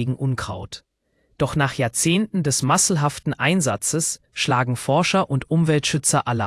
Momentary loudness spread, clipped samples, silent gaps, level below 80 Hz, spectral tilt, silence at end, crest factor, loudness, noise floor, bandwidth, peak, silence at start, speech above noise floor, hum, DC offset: 7 LU; under 0.1%; none; -52 dBFS; -4 dB/octave; 0 s; 18 dB; -20 LUFS; -65 dBFS; 12 kHz; -4 dBFS; 0 s; 45 dB; none; under 0.1%